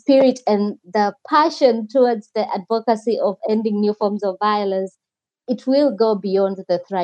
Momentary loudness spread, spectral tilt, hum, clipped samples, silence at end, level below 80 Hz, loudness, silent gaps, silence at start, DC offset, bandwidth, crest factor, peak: 7 LU; -6.5 dB/octave; none; under 0.1%; 0 s; -84 dBFS; -19 LUFS; none; 0.1 s; under 0.1%; 9 kHz; 16 dB; -2 dBFS